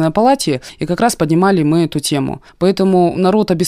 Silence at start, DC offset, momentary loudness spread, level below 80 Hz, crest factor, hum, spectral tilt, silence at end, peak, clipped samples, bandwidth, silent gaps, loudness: 0 s; under 0.1%; 7 LU; -44 dBFS; 12 dB; none; -6 dB/octave; 0 s; -2 dBFS; under 0.1%; 15.5 kHz; none; -14 LUFS